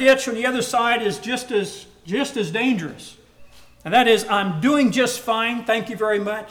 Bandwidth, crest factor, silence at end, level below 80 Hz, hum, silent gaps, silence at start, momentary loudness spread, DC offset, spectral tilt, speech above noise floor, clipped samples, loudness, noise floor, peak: 19 kHz; 16 dB; 0 s; -58 dBFS; 60 Hz at -50 dBFS; none; 0 s; 10 LU; under 0.1%; -4 dB/octave; 25 dB; under 0.1%; -20 LUFS; -45 dBFS; -6 dBFS